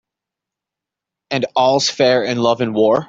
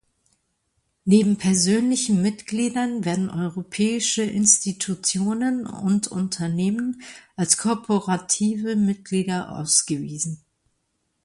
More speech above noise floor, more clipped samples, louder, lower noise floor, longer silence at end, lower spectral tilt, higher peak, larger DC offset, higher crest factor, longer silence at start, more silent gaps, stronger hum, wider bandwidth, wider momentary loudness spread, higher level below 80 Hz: first, 70 dB vs 51 dB; neither; first, -16 LUFS vs -22 LUFS; first, -85 dBFS vs -73 dBFS; second, 0.05 s vs 0.9 s; about the same, -4 dB/octave vs -4 dB/octave; about the same, -2 dBFS vs -2 dBFS; neither; second, 16 dB vs 22 dB; first, 1.3 s vs 1.05 s; neither; neither; second, 8 kHz vs 11.5 kHz; second, 6 LU vs 10 LU; about the same, -62 dBFS vs -60 dBFS